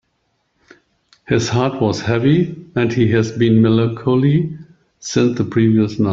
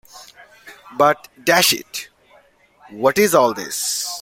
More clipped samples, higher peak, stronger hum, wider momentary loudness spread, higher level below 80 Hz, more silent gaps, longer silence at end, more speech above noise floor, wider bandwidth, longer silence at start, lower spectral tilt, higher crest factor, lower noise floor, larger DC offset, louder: neither; about the same, 0 dBFS vs -2 dBFS; neither; second, 7 LU vs 16 LU; first, -50 dBFS vs -60 dBFS; neither; about the same, 0 s vs 0 s; first, 52 dB vs 36 dB; second, 7.6 kHz vs 16.5 kHz; first, 1.3 s vs 0.15 s; first, -7 dB/octave vs -2 dB/octave; about the same, 16 dB vs 18 dB; first, -67 dBFS vs -53 dBFS; neither; about the same, -16 LUFS vs -17 LUFS